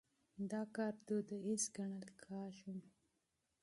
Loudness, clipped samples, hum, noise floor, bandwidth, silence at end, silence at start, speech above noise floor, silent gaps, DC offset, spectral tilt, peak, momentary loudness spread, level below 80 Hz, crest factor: -45 LUFS; under 0.1%; none; -86 dBFS; 11.5 kHz; 0.75 s; 0.35 s; 42 dB; none; under 0.1%; -4.5 dB/octave; -26 dBFS; 12 LU; -86 dBFS; 20 dB